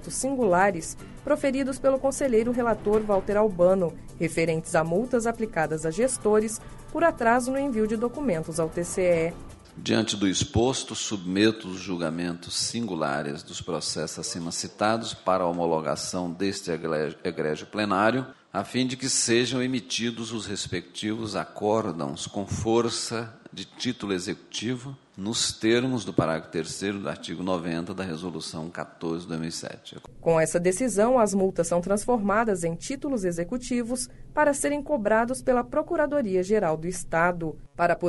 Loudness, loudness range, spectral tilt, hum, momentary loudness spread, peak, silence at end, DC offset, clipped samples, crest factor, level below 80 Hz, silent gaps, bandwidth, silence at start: -26 LUFS; 5 LU; -4.5 dB/octave; none; 10 LU; -6 dBFS; 0 s; under 0.1%; under 0.1%; 22 dB; -48 dBFS; none; 11.5 kHz; 0 s